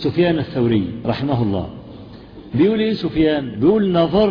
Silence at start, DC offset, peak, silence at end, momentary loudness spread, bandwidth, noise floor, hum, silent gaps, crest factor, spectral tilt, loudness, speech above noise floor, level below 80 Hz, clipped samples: 0 s; under 0.1%; -4 dBFS; 0 s; 21 LU; 5.2 kHz; -38 dBFS; none; none; 14 dB; -9.5 dB/octave; -18 LUFS; 21 dB; -42 dBFS; under 0.1%